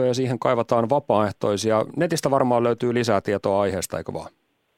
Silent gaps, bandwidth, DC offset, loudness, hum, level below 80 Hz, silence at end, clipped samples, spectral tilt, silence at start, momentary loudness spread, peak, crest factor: none; 16 kHz; under 0.1%; -22 LUFS; none; -60 dBFS; 0.5 s; under 0.1%; -5.5 dB/octave; 0 s; 7 LU; -4 dBFS; 18 dB